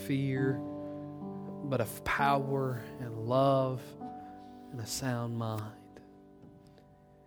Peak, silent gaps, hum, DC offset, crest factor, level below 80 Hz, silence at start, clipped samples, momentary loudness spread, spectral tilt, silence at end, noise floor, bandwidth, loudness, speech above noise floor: -14 dBFS; none; none; under 0.1%; 22 dB; -62 dBFS; 0 s; under 0.1%; 18 LU; -6 dB/octave; 0.3 s; -59 dBFS; over 20 kHz; -33 LUFS; 27 dB